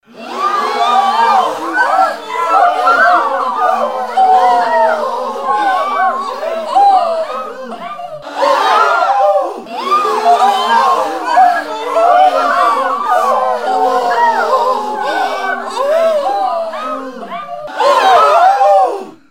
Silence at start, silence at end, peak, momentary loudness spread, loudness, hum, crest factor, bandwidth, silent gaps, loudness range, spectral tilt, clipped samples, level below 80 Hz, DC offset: 0.15 s; 0.15 s; 0 dBFS; 12 LU; -12 LUFS; none; 12 dB; 16 kHz; none; 3 LU; -2 dB/octave; under 0.1%; -66 dBFS; 0.8%